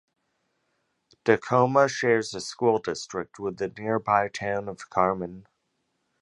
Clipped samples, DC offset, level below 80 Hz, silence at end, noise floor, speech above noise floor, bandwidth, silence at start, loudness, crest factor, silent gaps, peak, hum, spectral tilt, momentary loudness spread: under 0.1%; under 0.1%; -62 dBFS; 0.8 s; -76 dBFS; 51 dB; 11.5 kHz; 1.25 s; -26 LUFS; 24 dB; none; -4 dBFS; none; -5 dB/octave; 11 LU